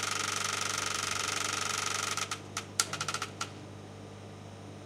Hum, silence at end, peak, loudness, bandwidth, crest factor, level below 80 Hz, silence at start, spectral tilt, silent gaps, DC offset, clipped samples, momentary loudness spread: 50 Hz at -50 dBFS; 0 s; -10 dBFS; -32 LUFS; 16.5 kHz; 26 dB; -68 dBFS; 0 s; -1 dB/octave; none; under 0.1%; under 0.1%; 16 LU